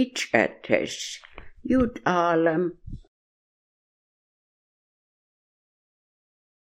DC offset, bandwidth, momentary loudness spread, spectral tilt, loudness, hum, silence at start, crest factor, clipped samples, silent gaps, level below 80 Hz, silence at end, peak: under 0.1%; 13 kHz; 18 LU; -4.5 dB/octave; -24 LUFS; none; 0 s; 26 dB; under 0.1%; none; -50 dBFS; 3.65 s; -2 dBFS